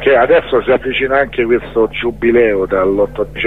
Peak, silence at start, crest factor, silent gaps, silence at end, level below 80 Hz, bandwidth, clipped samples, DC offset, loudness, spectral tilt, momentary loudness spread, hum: 0 dBFS; 0 s; 12 dB; none; 0 s; -36 dBFS; 4.2 kHz; under 0.1%; 1%; -13 LUFS; -7.5 dB/octave; 5 LU; none